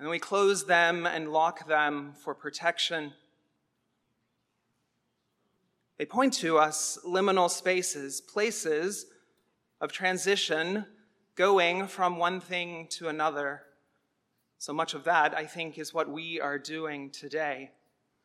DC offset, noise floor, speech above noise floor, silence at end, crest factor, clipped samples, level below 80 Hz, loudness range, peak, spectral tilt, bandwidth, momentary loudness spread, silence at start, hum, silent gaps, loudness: under 0.1%; -78 dBFS; 49 dB; 0.6 s; 22 dB; under 0.1%; under -90 dBFS; 7 LU; -10 dBFS; -2.5 dB/octave; 15 kHz; 12 LU; 0 s; none; none; -29 LUFS